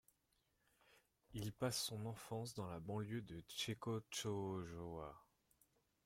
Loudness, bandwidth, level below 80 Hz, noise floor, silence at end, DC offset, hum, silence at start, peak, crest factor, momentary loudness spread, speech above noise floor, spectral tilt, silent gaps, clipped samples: -47 LUFS; 16.5 kHz; -72 dBFS; -83 dBFS; 0.85 s; under 0.1%; none; 0.9 s; -28 dBFS; 20 dB; 9 LU; 37 dB; -4.5 dB/octave; none; under 0.1%